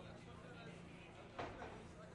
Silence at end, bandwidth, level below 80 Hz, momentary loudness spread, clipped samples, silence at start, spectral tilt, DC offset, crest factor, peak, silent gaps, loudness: 0 s; 11 kHz; -68 dBFS; 6 LU; under 0.1%; 0 s; -5.5 dB/octave; under 0.1%; 20 dB; -34 dBFS; none; -54 LUFS